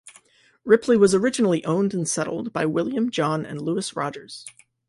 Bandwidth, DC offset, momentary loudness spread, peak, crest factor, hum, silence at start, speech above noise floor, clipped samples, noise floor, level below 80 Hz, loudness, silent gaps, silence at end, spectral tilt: 11.5 kHz; under 0.1%; 19 LU; -4 dBFS; 20 dB; none; 0.05 s; 34 dB; under 0.1%; -55 dBFS; -62 dBFS; -22 LUFS; none; 0.4 s; -5 dB/octave